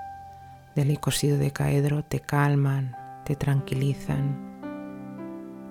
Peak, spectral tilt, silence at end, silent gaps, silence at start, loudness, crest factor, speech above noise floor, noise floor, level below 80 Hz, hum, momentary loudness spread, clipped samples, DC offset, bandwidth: -10 dBFS; -6 dB/octave; 0 s; none; 0 s; -26 LUFS; 16 dB; 21 dB; -46 dBFS; -50 dBFS; none; 15 LU; under 0.1%; under 0.1%; 16 kHz